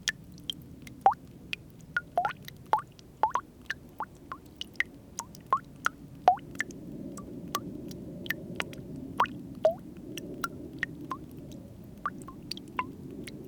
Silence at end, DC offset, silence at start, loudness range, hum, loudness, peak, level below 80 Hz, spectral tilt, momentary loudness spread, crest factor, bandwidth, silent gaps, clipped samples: 0 s; under 0.1%; 0 s; 4 LU; none; -34 LUFS; -6 dBFS; -60 dBFS; -4 dB/octave; 15 LU; 28 dB; over 20 kHz; none; under 0.1%